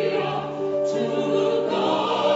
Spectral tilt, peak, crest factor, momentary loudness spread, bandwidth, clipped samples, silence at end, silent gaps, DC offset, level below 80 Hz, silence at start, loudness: -5.5 dB/octave; -10 dBFS; 14 dB; 5 LU; 8 kHz; under 0.1%; 0 s; none; under 0.1%; -66 dBFS; 0 s; -23 LUFS